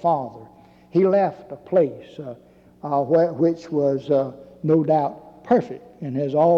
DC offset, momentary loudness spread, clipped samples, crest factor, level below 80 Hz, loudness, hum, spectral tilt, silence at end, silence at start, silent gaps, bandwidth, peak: under 0.1%; 18 LU; under 0.1%; 14 dB; -64 dBFS; -21 LUFS; none; -9.5 dB/octave; 0 s; 0.05 s; none; 7.2 kHz; -6 dBFS